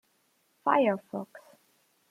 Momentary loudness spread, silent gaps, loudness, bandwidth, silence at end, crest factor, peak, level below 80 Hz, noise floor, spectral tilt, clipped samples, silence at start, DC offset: 15 LU; none; -29 LUFS; 15 kHz; 0.7 s; 22 dB; -10 dBFS; -84 dBFS; -71 dBFS; -7 dB/octave; under 0.1%; 0.65 s; under 0.1%